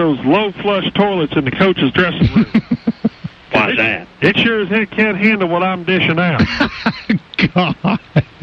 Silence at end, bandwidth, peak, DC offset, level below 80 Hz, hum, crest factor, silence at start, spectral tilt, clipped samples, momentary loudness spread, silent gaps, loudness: 0.2 s; 6.8 kHz; -2 dBFS; under 0.1%; -38 dBFS; none; 14 dB; 0 s; -7.5 dB/octave; under 0.1%; 6 LU; none; -15 LUFS